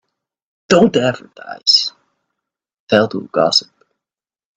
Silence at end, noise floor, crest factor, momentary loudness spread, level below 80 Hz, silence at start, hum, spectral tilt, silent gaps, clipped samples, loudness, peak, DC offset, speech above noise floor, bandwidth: 0.95 s; -90 dBFS; 18 dB; 11 LU; -58 dBFS; 0.7 s; none; -4 dB/octave; 2.79-2.87 s; under 0.1%; -14 LUFS; 0 dBFS; under 0.1%; 76 dB; 9 kHz